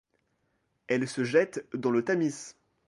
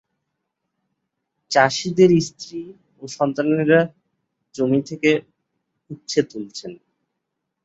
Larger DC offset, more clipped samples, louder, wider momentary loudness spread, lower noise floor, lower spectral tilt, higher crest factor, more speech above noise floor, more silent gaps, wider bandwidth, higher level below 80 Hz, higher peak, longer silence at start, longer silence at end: neither; neither; second, -29 LUFS vs -19 LUFS; second, 9 LU vs 22 LU; second, -75 dBFS vs -79 dBFS; about the same, -5.5 dB/octave vs -5.5 dB/octave; about the same, 20 dB vs 20 dB; second, 47 dB vs 60 dB; neither; first, 11.5 kHz vs 8 kHz; second, -74 dBFS vs -62 dBFS; second, -10 dBFS vs -2 dBFS; second, 0.9 s vs 1.5 s; second, 0.35 s vs 0.9 s